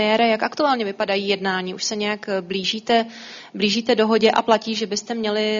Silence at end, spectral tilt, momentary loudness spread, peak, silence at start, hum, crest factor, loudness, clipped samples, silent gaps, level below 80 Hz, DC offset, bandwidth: 0 s; -2 dB/octave; 8 LU; -2 dBFS; 0 s; none; 18 dB; -20 LUFS; under 0.1%; none; -64 dBFS; under 0.1%; 7.4 kHz